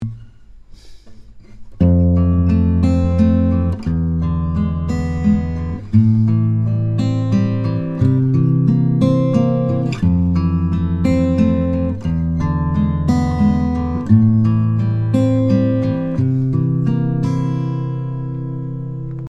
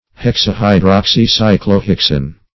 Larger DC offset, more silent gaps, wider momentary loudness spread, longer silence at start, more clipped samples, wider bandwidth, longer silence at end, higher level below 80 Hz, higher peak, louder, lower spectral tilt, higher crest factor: second, under 0.1% vs 0.8%; neither; first, 7 LU vs 4 LU; second, 0 s vs 0.2 s; second, under 0.1% vs 0.2%; first, 8 kHz vs 6.2 kHz; second, 0.05 s vs 0.2 s; second, -36 dBFS vs -30 dBFS; about the same, 0 dBFS vs 0 dBFS; second, -17 LUFS vs -12 LUFS; first, -9.5 dB/octave vs -6 dB/octave; about the same, 16 dB vs 12 dB